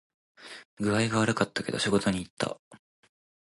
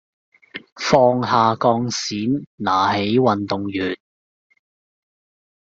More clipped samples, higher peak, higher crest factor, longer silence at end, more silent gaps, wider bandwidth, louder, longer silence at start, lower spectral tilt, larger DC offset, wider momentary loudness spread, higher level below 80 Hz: neither; second, -10 dBFS vs -2 dBFS; about the same, 22 dB vs 20 dB; second, 0.8 s vs 1.8 s; first, 0.65-0.77 s, 2.30-2.37 s, 2.59-2.71 s vs 0.72-0.76 s, 2.47-2.58 s; first, 11.5 kHz vs 7.8 kHz; second, -28 LUFS vs -19 LUFS; second, 0.4 s vs 0.55 s; about the same, -5 dB/octave vs -5 dB/octave; neither; first, 20 LU vs 13 LU; about the same, -58 dBFS vs -58 dBFS